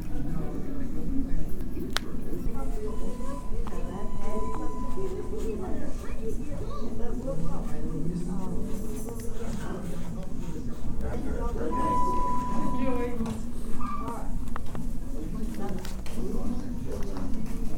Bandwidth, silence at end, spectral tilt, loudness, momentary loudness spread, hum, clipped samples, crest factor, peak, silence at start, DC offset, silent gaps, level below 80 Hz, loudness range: 11.5 kHz; 0 s; -6.5 dB/octave; -34 LUFS; 7 LU; none; under 0.1%; 20 dB; -4 dBFS; 0 s; under 0.1%; none; -32 dBFS; 5 LU